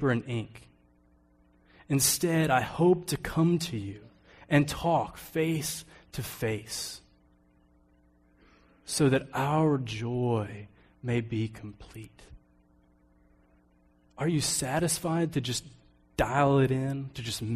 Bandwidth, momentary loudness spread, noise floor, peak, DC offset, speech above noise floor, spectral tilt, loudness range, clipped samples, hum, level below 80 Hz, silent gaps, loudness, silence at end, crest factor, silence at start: 15.5 kHz; 17 LU; -64 dBFS; -10 dBFS; under 0.1%; 36 dB; -5 dB/octave; 10 LU; under 0.1%; none; -54 dBFS; none; -29 LUFS; 0 s; 20 dB; 0 s